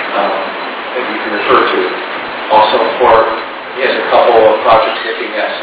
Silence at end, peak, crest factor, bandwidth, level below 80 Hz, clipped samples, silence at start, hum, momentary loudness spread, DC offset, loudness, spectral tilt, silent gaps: 0 s; 0 dBFS; 12 dB; 4 kHz; -46 dBFS; 0.5%; 0 s; none; 11 LU; under 0.1%; -11 LUFS; -7 dB/octave; none